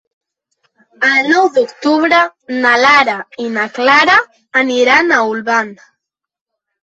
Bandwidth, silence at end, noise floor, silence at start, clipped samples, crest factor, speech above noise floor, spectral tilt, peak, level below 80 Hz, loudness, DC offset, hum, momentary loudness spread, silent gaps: 8.2 kHz; 1.1 s; -75 dBFS; 1 s; under 0.1%; 14 dB; 62 dB; -3 dB/octave; 0 dBFS; -58 dBFS; -11 LUFS; under 0.1%; none; 9 LU; none